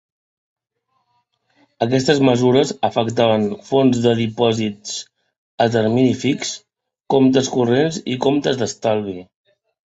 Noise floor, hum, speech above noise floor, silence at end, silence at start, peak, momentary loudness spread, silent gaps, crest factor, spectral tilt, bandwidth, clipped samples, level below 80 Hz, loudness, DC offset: -70 dBFS; none; 53 dB; 0.65 s; 1.8 s; -2 dBFS; 9 LU; 5.38-5.58 s; 18 dB; -5.5 dB/octave; 8 kHz; under 0.1%; -56 dBFS; -18 LUFS; under 0.1%